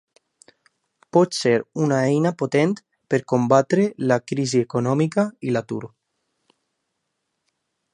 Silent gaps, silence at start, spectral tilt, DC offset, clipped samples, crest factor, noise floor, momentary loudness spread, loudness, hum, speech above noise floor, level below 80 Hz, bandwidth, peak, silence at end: none; 1.15 s; -6 dB/octave; under 0.1%; under 0.1%; 20 dB; -77 dBFS; 8 LU; -21 LUFS; none; 57 dB; -66 dBFS; 11.5 kHz; -2 dBFS; 2.05 s